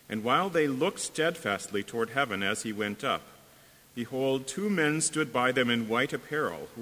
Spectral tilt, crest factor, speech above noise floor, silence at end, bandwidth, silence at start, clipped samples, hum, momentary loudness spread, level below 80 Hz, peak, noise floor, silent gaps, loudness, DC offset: -3.5 dB/octave; 20 dB; 27 dB; 0 s; 16 kHz; 0.1 s; under 0.1%; none; 7 LU; -66 dBFS; -10 dBFS; -57 dBFS; none; -29 LUFS; under 0.1%